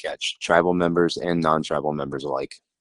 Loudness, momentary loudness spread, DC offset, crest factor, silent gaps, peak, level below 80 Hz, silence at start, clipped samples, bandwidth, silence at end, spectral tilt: -23 LUFS; 9 LU; under 0.1%; 22 dB; none; -2 dBFS; -54 dBFS; 0 s; under 0.1%; 11 kHz; 0.25 s; -5 dB/octave